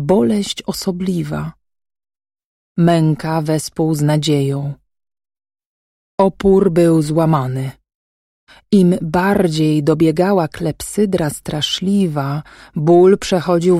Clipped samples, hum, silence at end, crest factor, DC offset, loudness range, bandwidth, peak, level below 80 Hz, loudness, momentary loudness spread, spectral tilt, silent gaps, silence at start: under 0.1%; none; 0 s; 14 dB; under 0.1%; 4 LU; 15 kHz; -2 dBFS; -44 dBFS; -16 LUFS; 11 LU; -6.5 dB/octave; 2.45-2.75 s, 5.66-6.18 s, 7.95-8.47 s; 0 s